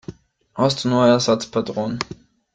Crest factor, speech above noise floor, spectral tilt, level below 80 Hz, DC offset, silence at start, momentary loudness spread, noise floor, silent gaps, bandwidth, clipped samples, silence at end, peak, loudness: 18 dB; 21 dB; -5 dB/octave; -54 dBFS; under 0.1%; 0.1 s; 16 LU; -40 dBFS; none; 9.2 kHz; under 0.1%; 0.4 s; -2 dBFS; -19 LUFS